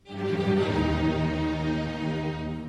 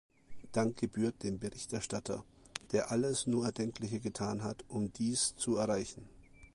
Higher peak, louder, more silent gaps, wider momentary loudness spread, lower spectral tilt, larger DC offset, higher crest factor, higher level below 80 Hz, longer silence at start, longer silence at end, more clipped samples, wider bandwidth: about the same, -14 dBFS vs -14 dBFS; first, -27 LUFS vs -36 LUFS; neither; second, 6 LU vs 9 LU; first, -7.5 dB/octave vs -4.5 dB/octave; neither; second, 14 dB vs 24 dB; first, -40 dBFS vs -62 dBFS; second, 0.05 s vs 0.3 s; about the same, 0 s vs 0.1 s; neither; second, 10 kHz vs 11.5 kHz